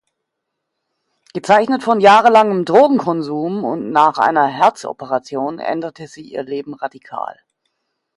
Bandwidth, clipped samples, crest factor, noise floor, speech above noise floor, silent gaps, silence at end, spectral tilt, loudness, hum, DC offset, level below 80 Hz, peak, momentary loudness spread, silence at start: 11.5 kHz; under 0.1%; 16 dB; -77 dBFS; 61 dB; none; 0.85 s; -5.5 dB/octave; -15 LUFS; none; under 0.1%; -64 dBFS; 0 dBFS; 18 LU; 1.35 s